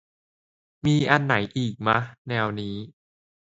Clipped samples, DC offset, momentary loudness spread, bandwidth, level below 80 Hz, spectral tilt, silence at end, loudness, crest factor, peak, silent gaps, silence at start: under 0.1%; under 0.1%; 13 LU; 7.8 kHz; -56 dBFS; -6.5 dB/octave; 0.55 s; -24 LUFS; 26 dB; 0 dBFS; 2.18-2.25 s; 0.85 s